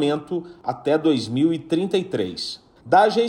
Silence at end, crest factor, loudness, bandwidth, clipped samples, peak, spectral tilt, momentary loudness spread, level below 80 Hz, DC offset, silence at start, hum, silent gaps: 0 s; 16 dB; -22 LUFS; 10.5 kHz; under 0.1%; -4 dBFS; -6 dB/octave; 12 LU; -62 dBFS; under 0.1%; 0 s; none; none